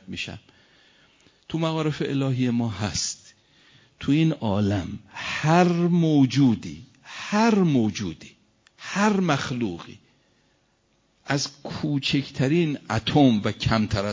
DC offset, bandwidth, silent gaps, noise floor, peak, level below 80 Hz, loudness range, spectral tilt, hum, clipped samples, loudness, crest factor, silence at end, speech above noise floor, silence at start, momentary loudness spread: under 0.1%; 7.6 kHz; none; -66 dBFS; -6 dBFS; -50 dBFS; 6 LU; -5.5 dB/octave; none; under 0.1%; -23 LUFS; 18 dB; 0 s; 44 dB; 0.1 s; 15 LU